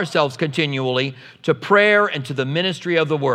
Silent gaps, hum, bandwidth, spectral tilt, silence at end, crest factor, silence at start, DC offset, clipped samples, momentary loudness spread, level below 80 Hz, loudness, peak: none; none; 13 kHz; -5.5 dB/octave; 0 s; 18 dB; 0 s; under 0.1%; under 0.1%; 9 LU; -72 dBFS; -19 LUFS; -2 dBFS